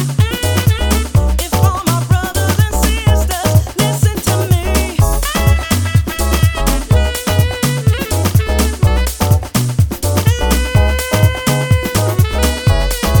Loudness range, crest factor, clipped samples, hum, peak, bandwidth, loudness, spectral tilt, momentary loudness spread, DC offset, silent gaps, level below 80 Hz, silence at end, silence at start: 1 LU; 12 dB; under 0.1%; none; 0 dBFS; 19.5 kHz; -14 LUFS; -5 dB/octave; 2 LU; under 0.1%; none; -18 dBFS; 0 s; 0 s